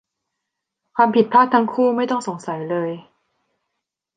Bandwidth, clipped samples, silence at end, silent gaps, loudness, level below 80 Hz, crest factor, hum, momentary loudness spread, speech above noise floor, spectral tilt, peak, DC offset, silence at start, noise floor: 9.4 kHz; under 0.1%; 1.15 s; none; -19 LUFS; -70 dBFS; 18 dB; none; 14 LU; 63 dB; -6 dB/octave; -2 dBFS; under 0.1%; 0.95 s; -80 dBFS